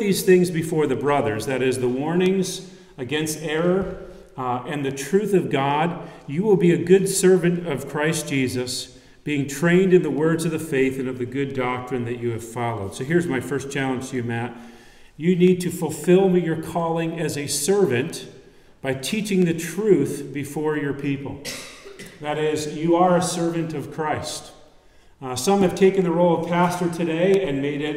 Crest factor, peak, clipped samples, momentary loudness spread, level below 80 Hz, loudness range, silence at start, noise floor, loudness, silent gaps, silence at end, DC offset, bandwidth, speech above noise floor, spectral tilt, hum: 18 dB; -4 dBFS; under 0.1%; 13 LU; -54 dBFS; 5 LU; 0 s; -51 dBFS; -22 LUFS; none; 0 s; under 0.1%; 16 kHz; 30 dB; -5.5 dB/octave; none